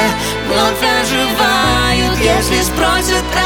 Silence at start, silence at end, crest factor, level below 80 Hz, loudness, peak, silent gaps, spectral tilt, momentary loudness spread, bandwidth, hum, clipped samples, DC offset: 0 s; 0 s; 12 dB; -26 dBFS; -13 LUFS; 0 dBFS; none; -3.5 dB/octave; 3 LU; over 20 kHz; none; under 0.1%; under 0.1%